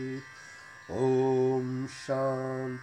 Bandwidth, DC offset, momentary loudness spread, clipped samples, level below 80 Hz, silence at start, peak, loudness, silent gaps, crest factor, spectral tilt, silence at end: 10 kHz; under 0.1%; 20 LU; under 0.1%; -68 dBFS; 0 s; -16 dBFS; -30 LUFS; none; 14 dB; -7 dB/octave; 0 s